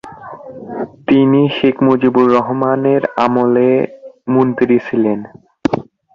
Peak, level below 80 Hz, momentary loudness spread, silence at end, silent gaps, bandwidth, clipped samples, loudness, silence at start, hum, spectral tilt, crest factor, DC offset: 0 dBFS; -52 dBFS; 15 LU; 0.35 s; none; 6.8 kHz; under 0.1%; -14 LUFS; 0.05 s; none; -8.5 dB/octave; 14 dB; under 0.1%